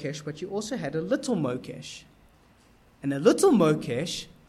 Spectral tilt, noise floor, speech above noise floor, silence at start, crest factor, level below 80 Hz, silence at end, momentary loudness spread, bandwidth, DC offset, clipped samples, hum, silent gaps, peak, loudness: -5.5 dB/octave; -58 dBFS; 32 dB; 0 s; 20 dB; -60 dBFS; 0.25 s; 18 LU; 15 kHz; under 0.1%; under 0.1%; none; none; -6 dBFS; -26 LUFS